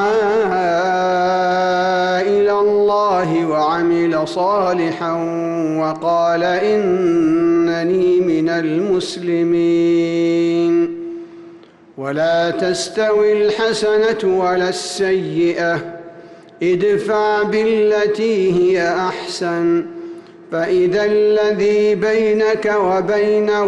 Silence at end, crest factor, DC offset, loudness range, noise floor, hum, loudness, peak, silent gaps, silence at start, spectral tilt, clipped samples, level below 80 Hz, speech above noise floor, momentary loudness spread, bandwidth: 0 s; 8 dB; under 0.1%; 2 LU; -42 dBFS; none; -16 LUFS; -8 dBFS; none; 0 s; -5.5 dB/octave; under 0.1%; -56 dBFS; 27 dB; 6 LU; 11.5 kHz